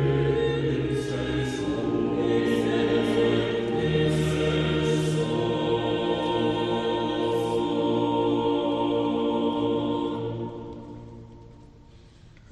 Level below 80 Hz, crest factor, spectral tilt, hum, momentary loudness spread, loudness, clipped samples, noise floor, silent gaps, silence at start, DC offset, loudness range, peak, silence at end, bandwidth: -46 dBFS; 14 dB; -6.5 dB/octave; none; 6 LU; -25 LUFS; under 0.1%; -50 dBFS; none; 0 s; under 0.1%; 4 LU; -12 dBFS; 0.25 s; 12.5 kHz